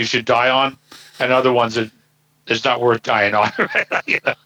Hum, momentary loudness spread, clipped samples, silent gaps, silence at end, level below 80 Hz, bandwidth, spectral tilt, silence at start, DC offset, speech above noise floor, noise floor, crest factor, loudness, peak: none; 7 LU; under 0.1%; none; 0.1 s; -64 dBFS; over 20 kHz; -4 dB/octave; 0 s; under 0.1%; 41 dB; -59 dBFS; 16 dB; -17 LUFS; -2 dBFS